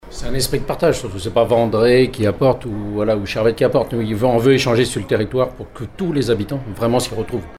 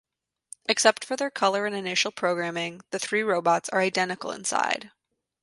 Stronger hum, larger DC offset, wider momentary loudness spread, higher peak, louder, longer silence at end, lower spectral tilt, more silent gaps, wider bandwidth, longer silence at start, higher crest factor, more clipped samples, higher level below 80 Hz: neither; neither; about the same, 9 LU vs 10 LU; about the same, -2 dBFS vs -2 dBFS; first, -18 LUFS vs -25 LUFS; second, 0 s vs 0.55 s; first, -5.5 dB/octave vs -2.5 dB/octave; neither; first, 16 kHz vs 11.5 kHz; second, 0.05 s vs 0.7 s; second, 14 dB vs 24 dB; neither; first, -36 dBFS vs -74 dBFS